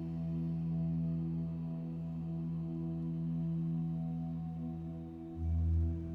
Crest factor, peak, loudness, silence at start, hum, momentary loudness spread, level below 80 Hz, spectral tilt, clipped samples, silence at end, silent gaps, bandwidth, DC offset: 12 dB; -24 dBFS; -38 LUFS; 0 s; none; 6 LU; -46 dBFS; -11.5 dB/octave; under 0.1%; 0 s; none; 3.2 kHz; under 0.1%